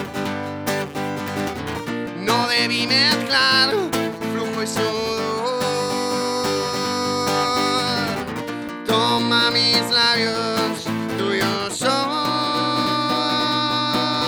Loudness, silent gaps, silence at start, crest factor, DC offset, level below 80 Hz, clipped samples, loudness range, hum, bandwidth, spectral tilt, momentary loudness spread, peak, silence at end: -20 LUFS; none; 0 s; 18 dB; under 0.1%; -54 dBFS; under 0.1%; 3 LU; none; over 20 kHz; -3.5 dB/octave; 11 LU; -4 dBFS; 0 s